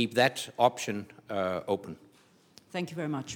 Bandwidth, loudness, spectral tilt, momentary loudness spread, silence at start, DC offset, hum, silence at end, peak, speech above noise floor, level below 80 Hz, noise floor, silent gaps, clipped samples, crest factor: 18.5 kHz; -31 LUFS; -4.5 dB/octave; 13 LU; 0 s; under 0.1%; none; 0 s; -8 dBFS; 32 dB; -78 dBFS; -62 dBFS; none; under 0.1%; 22 dB